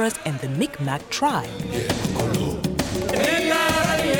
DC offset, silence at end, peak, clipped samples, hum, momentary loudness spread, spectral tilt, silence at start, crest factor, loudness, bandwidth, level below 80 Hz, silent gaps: under 0.1%; 0 s; -8 dBFS; under 0.1%; none; 8 LU; -4.5 dB/octave; 0 s; 16 dB; -23 LUFS; over 20 kHz; -42 dBFS; none